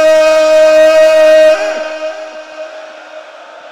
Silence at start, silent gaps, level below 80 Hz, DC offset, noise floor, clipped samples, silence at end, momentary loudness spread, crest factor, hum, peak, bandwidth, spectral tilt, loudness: 0 s; none; -52 dBFS; under 0.1%; -32 dBFS; under 0.1%; 0 s; 21 LU; 8 dB; none; 0 dBFS; 13.5 kHz; -1.5 dB/octave; -7 LUFS